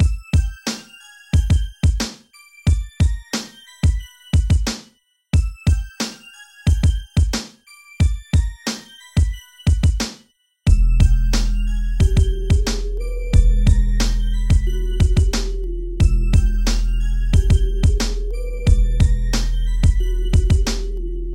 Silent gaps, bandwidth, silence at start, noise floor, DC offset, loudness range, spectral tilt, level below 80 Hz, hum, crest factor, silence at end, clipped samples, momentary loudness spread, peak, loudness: none; 12.5 kHz; 0 s; -55 dBFS; under 0.1%; 3 LU; -5.5 dB/octave; -18 dBFS; none; 16 dB; 0 s; under 0.1%; 10 LU; -2 dBFS; -20 LUFS